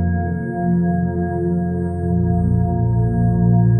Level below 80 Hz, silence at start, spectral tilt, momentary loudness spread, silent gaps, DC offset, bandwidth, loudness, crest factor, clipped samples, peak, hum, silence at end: -32 dBFS; 0 s; -14 dB/octave; 6 LU; none; under 0.1%; 1.8 kHz; -19 LUFS; 12 dB; under 0.1%; -4 dBFS; none; 0 s